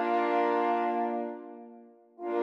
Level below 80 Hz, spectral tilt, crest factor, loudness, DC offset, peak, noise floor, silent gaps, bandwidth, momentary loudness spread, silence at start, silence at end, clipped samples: under -90 dBFS; -6 dB/octave; 14 dB; -29 LUFS; under 0.1%; -16 dBFS; -53 dBFS; none; 6.6 kHz; 20 LU; 0 s; 0 s; under 0.1%